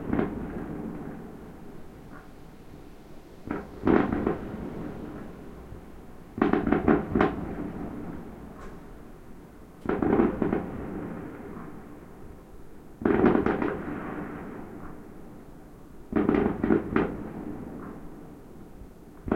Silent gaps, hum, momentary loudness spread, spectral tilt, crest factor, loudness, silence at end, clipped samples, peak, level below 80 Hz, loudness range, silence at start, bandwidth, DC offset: none; none; 24 LU; -8.5 dB/octave; 26 dB; -29 LUFS; 0 s; under 0.1%; -4 dBFS; -46 dBFS; 3 LU; 0 s; 16 kHz; under 0.1%